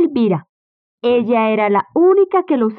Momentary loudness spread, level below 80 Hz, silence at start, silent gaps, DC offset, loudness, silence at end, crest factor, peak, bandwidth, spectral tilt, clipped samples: 6 LU; -64 dBFS; 0 s; 0.49-0.98 s; under 0.1%; -15 LUFS; 0.05 s; 10 dB; -6 dBFS; 4.6 kHz; -11 dB/octave; under 0.1%